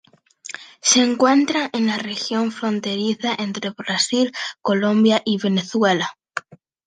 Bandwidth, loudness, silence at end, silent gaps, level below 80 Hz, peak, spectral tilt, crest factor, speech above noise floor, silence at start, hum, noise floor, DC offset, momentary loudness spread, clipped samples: 9.8 kHz; -19 LUFS; 0.3 s; none; -70 dBFS; -2 dBFS; -3.5 dB/octave; 18 dB; 22 dB; 0.45 s; none; -41 dBFS; under 0.1%; 15 LU; under 0.1%